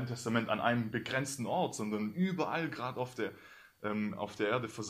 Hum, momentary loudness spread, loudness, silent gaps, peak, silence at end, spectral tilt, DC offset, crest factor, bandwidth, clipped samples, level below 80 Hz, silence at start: none; 7 LU; -35 LUFS; none; -16 dBFS; 0 s; -5 dB/octave; under 0.1%; 20 dB; 15 kHz; under 0.1%; -72 dBFS; 0 s